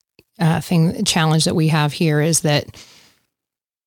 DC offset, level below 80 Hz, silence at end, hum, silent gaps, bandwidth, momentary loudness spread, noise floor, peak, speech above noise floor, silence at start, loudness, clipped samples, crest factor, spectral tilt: under 0.1%; -52 dBFS; 1.05 s; none; none; 18 kHz; 5 LU; -87 dBFS; -2 dBFS; 70 dB; 0.4 s; -17 LUFS; under 0.1%; 18 dB; -4.5 dB/octave